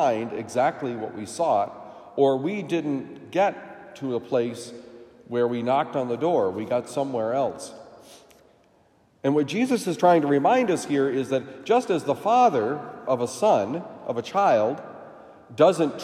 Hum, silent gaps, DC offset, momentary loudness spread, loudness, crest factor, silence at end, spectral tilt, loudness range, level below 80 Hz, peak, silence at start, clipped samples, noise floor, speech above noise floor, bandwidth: none; none; under 0.1%; 14 LU; -24 LUFS; 18 dB; 0 s; -5.5 dB/octave; 6 LU; -74 dBFS; -6 dBFS; 0 s; under 0.1%; -61 dBFS; 37 dB; 15 kHz